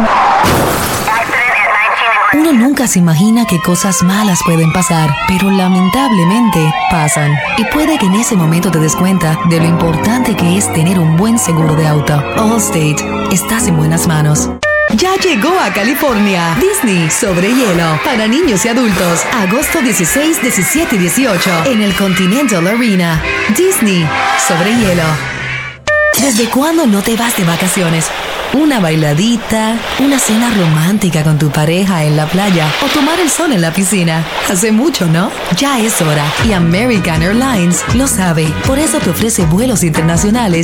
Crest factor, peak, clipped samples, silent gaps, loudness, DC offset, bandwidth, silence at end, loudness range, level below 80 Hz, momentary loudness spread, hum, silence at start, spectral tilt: 10 dB; 0 dBFS; under 0.1%; none; -11 LUFS; under 0.1%; 17.5 kHz; 0 s; 2 LU; -32 dBFS; 3 LU; none; 0 s; -4.5 dB/octave